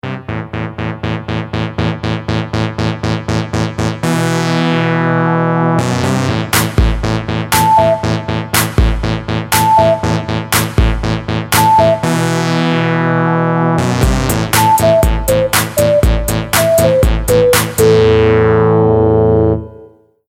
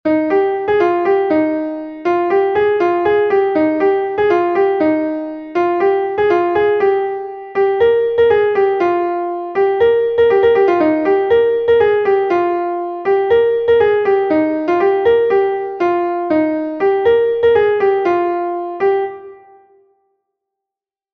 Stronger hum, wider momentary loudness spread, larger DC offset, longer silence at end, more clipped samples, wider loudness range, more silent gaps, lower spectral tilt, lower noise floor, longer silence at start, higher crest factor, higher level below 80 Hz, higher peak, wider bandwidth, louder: neither; about the same, 8 LU vs 7 LU; neither; second, 0.45 s vs 1.8 s; neither; first, 5 LU vs 2 LU; neither; second, -5 dB/octave vs -7 dB/octave; second, -41 dBFS vs -87 dBFS; about the same, 0.05 s vs 0.05 s; about the same, 12 dB vs 12 dB; first, -24 dBFS vs -50 dBFS; about the same, 0 dBFS vs -2 dBFS; first, 17 kHz vs 6.2 kHz; about the same, -13 LUFS vs -15 LUFS